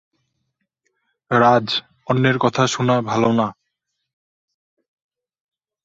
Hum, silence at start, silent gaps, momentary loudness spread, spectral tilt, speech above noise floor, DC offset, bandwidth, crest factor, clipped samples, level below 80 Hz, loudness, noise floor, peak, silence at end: none; 1.3 s; none; 9 LU; -5.5 dB/octave; 60 dB; under 0.1%; 7.8 kHz; 20 dB; under 0.1%; -60 dBFS; -18 LUFS; -77 dBFS; -2 dBFS; 2.3 s